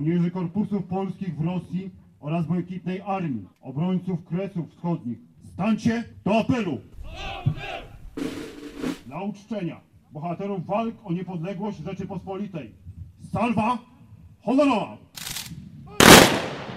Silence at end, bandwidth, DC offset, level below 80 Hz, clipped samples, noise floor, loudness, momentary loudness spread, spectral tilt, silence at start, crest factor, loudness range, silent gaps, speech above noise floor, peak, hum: 0 s; 16 kHz; under 0.1%; -48 dBFS; under 0.1%; -49 dBFS; -23 LUFS; 16 LU; -4 dB/octave; 0 s; 24 dB; 6 LU; none; 22 dB; 0 dBFS; none